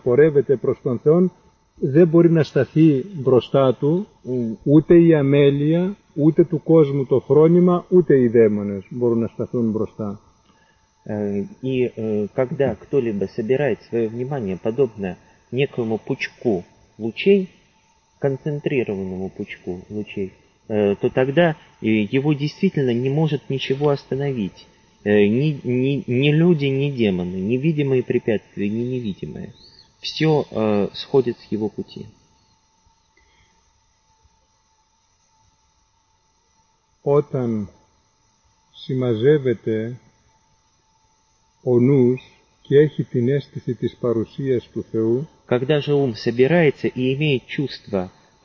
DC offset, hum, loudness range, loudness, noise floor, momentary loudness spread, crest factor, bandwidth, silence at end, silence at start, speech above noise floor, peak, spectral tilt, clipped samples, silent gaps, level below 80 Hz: under 0.1%; none; 9 LU; -20 LUFS; -63 dBFS; 13 LU; 16 dB; 6.8 kHz; 0.35 s; 0.05 s; 44 dB; -4 dBFS; -8.5 dB/octave; under 0.1%; none; -54 dBFS